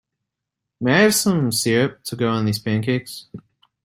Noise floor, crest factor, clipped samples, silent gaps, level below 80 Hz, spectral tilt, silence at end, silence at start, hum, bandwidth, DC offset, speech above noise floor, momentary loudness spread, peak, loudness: -82 dBFS; 18 dB; under 0.1%; none; -58 dBFS; -4.5 dB/octave; 0.45 s; 0.8 s; none; 16 kHz; under 0.1%; 63 dB; 10 LU; -2 dBFS; -19 LUFS